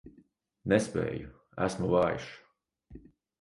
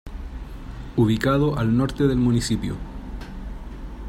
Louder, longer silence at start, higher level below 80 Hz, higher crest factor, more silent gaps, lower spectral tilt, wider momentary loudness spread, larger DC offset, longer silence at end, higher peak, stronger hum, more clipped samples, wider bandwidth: second, -31 LUFS vs -22 LUFS; about the same, 0.05 s vs 0.05 s; second, -56 dBFS vs -34 dBFS; first, 24 dB vs 16 dB; neither; about the same, -6 dB/octave vs -6.5 dB/octave; second, 15 LU vs 18 LU; neither; first, 0.45 s vs 0 s; second, -10 dBFS vs -6 dBFS; neither; neither; second, 11.5 kHz vs 16 kHz